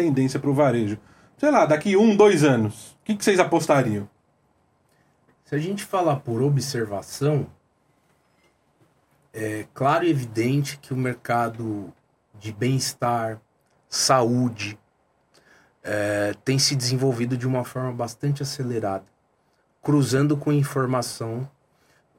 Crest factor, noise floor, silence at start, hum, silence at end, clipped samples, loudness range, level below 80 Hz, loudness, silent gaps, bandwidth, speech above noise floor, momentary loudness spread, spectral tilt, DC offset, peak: 22 dB; -66 dBFS; 0 s; none; 0.7 s; under 0.1%; 7 LU; -64 dBFS; -23 LUFS; none; 16.5 kHz; 44 dB; 14 LU; -5.5 dB/octave; under 0.1%; -2 dBFS